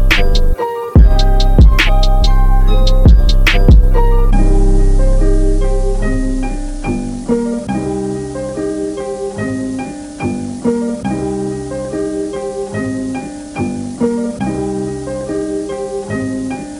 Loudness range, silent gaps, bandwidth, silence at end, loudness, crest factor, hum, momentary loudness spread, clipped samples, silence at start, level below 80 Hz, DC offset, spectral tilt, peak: 8 LU; none; 11 kHz; 0 s; -16 LUFS; 12 dB; none; 11 LU; under 0.1%; 0 s; -12 dBFS; under 0.1%; -6.5 dB/octave; 0 dBFS